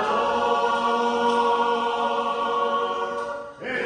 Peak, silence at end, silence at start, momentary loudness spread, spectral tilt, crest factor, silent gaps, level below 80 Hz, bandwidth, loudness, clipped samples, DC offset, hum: -8 dBFS; 0 s; 0 s; 8 LU; -3.5 dB/octave; 14 dB; none; -60 dBFS; 10 kHz; -23 LUFS; under 0.1%; under 0.1%; none